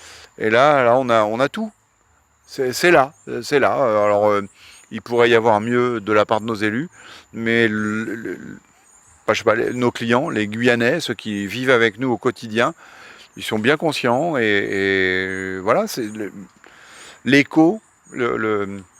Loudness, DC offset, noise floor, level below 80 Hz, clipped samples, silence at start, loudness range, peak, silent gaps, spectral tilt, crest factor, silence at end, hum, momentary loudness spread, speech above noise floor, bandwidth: -18 LUFS; under 0.1%; -59 dBFS; -60 dBFS; under 0.1%; 0.05 s; 3 LU; 0 dBFS; none; -5 dB/octave; 20 dB; 0.2 s; none; 14 LU; 41 dB; 16 kHz